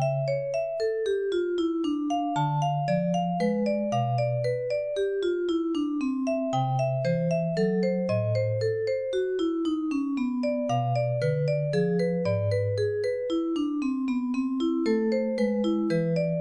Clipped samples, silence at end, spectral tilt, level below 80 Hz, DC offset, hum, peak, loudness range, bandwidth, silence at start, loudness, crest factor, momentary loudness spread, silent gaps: under 0.1%; 0 s; -8 dB/octave; -62 dBFS; under 0.1%; none; -14 dBFS; 1 LU; 10 kHz; 0 s; -27 LUFS; 12 dB; 3 LU; none